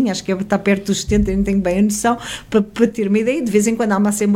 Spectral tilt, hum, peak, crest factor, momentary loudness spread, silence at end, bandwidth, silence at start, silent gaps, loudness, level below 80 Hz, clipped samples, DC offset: -5.5 dB/octave; none; -2 dBFS; 16 dB; 3 LU; 0 s; 16 kHz; 0 s; none; -17 LUFS; -34 dBFS; under 0.1%; under 0.1%